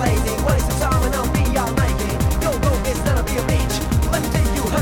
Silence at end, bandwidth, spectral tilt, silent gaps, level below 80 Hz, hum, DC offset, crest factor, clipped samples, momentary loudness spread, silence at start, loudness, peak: 0 s; 20 kHz; -5.5 dB/octave; none; -22 dBFS; none; under 0.1%; 14 dB; under 0.1%; 1 LU; 0 s; -20 LUFS; -4 dBFS